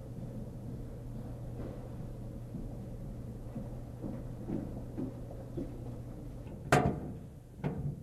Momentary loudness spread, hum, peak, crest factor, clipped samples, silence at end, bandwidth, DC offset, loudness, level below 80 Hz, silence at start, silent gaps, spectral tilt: 11 LU; none; -12 dBFS; 26 dB; under 0.1%; 0 s; 15.5 kHz; under 0.1%; -40 LUFS; -48 dBFS; 0 s; none; -6.5 dB/octave